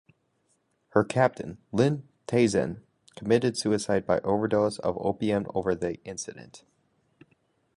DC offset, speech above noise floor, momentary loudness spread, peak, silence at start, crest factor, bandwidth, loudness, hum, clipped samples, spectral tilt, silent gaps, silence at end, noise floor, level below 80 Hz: under 0.1%; 45 dB; 13 LU; -6 dBFS; 0.95 s; 22 dB; 11.5 kHz; -27 LUFS; none; under 0.1%; -6 dB/octave; none; 1.2 s; -72 dBFS; -58 dBFS